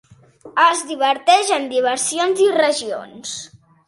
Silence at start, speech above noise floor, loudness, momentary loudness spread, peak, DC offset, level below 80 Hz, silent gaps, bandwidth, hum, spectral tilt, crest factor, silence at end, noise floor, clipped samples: 0.45 s; 26 dB; -17 LUFS; 14 LU; 0 dBFS; under 0.1%; -68 dBFS; none; 11.5 kHz; none; -1 dB/octave; 18 dB; 0.4 s; -44 dBFS; under 0.1%